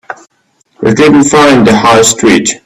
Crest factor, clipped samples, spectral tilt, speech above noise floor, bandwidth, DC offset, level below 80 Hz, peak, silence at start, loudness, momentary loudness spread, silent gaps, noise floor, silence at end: 8 dB; 0.6%; -4 dB/octave; 49 dB; over 20 kHz; under 0.1%; -40 dBFS; 0 dBFS; 0.1 s; -6 LUFS; 8 LU; none; -55 dBFS; 0.1 s